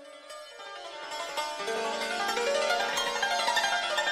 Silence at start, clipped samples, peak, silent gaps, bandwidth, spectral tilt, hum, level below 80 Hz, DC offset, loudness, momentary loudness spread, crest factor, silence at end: 0 s; under 0.1%; -14 dBFS; none; 16 kHz; 0 dB/octave; none; -66 dBFS; under 0.1%; -29 LUFS; 16 LU; 16 dB; 0 s